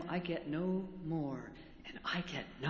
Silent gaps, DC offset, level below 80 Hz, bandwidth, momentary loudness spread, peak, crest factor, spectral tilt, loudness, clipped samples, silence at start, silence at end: none; under 0.1%; -64 dBFS; 7.2 kHz; 13 LU; -24 dBFS; 16 dB; -6.5 dB/octave; -40 LUFS; under 0.1%; 0 s; 0 s